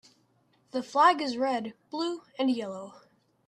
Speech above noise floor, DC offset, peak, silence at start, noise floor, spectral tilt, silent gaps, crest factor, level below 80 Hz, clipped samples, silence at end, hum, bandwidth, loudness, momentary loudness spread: 40 dB; under 0.1%; -8 dBFS; 0.75 s; -68 dBFS; -4 dB/octave; none; 22 dB; -80 dBFS; under 0.1%; 0.5 s; none; 10.5 kHz; -28 LUFS; 16 LU